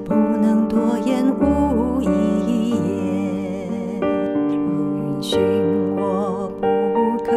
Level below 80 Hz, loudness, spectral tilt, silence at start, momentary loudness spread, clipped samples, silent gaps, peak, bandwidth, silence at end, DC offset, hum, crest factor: -42 dBFS; -20 LUFS; -7.5 dB/octave; 0 s; 6 LU; under 0.1%; none; -6 dBFS; 13 kHz; 0 s; under 0.1%; none; 14 dB